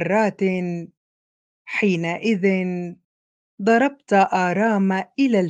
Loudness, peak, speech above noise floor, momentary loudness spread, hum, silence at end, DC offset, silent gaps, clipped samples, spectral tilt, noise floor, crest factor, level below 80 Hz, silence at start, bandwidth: -21 LUFS; -4 dBFS; over 70 dB; 9 LU; none; 0 s; under 0.1%; 0.97-1.65 s, 3.05-3.58 s; under 0.1%; -7 dB/octave; under -90 dBFS; 16 dB; -70 dBFS; 0 s; 9 kHz